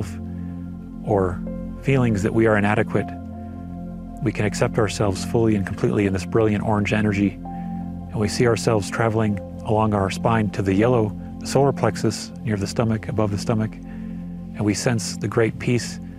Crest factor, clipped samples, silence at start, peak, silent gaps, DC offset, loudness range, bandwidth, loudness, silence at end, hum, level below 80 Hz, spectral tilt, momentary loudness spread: 20 dB; under 0.1%; 0 s; -2 dBFS; none; under 0.1%; 3 LU; 14.5 kHz; -22 LUFS; 0 s; none; -44 dBFS; -6.5 dB/octave; 13 LU